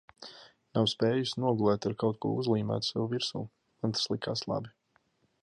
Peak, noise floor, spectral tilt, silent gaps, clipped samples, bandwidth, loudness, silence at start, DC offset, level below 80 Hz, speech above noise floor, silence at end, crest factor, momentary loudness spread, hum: -14 dBFS; -72 dBFS; -5.5 dB/octave; none; under 0.1%; 11.5 kHz; -31 LUFS; 0.2 s; under 0.1%; -66 dBFS; 41 dB; 0.75 s; 18 dB; 16 LU; none